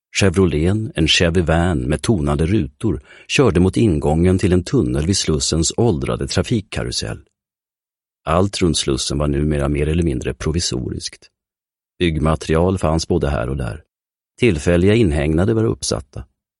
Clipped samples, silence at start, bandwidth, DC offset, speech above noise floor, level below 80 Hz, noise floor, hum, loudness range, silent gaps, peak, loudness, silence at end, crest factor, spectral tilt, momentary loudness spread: under 0.1%; 0.15 s; 12 kHz; under 0.1%; over 73 dB; -30 dBFS; under -90 dBFS; none; 4 LU; none; -2 dBFS; -18 LUFS; 0.35 s; 16 dB; -5.5 dB/octave; 9 LU